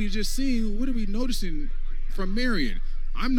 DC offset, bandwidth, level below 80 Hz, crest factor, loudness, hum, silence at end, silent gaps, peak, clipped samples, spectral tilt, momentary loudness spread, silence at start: under 0.1%; 13.5 kHz; -24 dBFS; 10 dB; -30 LUFS; none; 0 s; none; -12 dBFS; under 0.1%; -4.5 dB/octave; 11 LU; 0 s